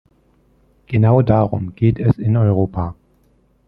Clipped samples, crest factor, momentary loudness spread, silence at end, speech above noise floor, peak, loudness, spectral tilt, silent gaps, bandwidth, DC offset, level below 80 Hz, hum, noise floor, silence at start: under 0.1%; 16 dB; 9 LU; 0.75 s; 42 dB; -2 dBFS; -17 LUFS; -12 dB/octave; none; 4.2 kHz; under 0.1%; -42 dBFS; none; -57 dBFS; 0.9 s